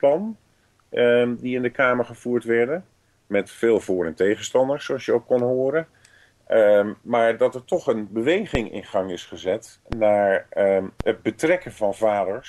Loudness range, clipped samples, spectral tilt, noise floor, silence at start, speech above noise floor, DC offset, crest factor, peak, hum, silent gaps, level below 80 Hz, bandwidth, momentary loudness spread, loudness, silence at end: 2 LU; under 0.1%; -5.5 dB/octave; -55 dBFS; 0.05 s; 33 dB; under 0.1%; 16 dB; -6 dBFS; none; none; -48 dBFS; 12.5 kHz; 8 LU; -22 LUFS; 0 s